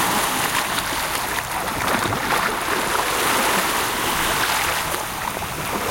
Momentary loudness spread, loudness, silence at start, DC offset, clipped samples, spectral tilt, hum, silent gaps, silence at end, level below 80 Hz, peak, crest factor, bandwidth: 6 LU; -21 LUFS; 0 s; under 0.1%; under 0.1%; -2 dB/octave; none; none; 0 s; -42 dBFS; -6 dBFS; 16 dB; 17 kHz